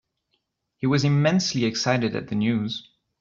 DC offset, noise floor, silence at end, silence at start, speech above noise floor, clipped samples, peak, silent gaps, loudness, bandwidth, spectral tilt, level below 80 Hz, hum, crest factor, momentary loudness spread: under 0.1%; -75 dBFS; 0.4 s; 0.8 s; 52 dB; under 0.1%; -6 dBFS; none; -23 LUFS; 7.6 kHz; -5.5 dB/octave; -60 dBFS; none; 18 dB; 9 LU